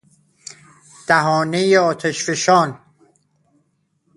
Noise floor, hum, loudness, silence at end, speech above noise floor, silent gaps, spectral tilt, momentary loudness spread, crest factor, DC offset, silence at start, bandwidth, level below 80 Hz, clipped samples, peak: -66 dBFS; 50 Hz at -55 dBFS; -17 LUFS; 1.4 s; 50 dB; none; -4 dB/octave; 23 LU; 20 dB; under 0.1%; 1.1 s; 11.5 kHz; -64 dBFS; under 0.1%; 0 dBFS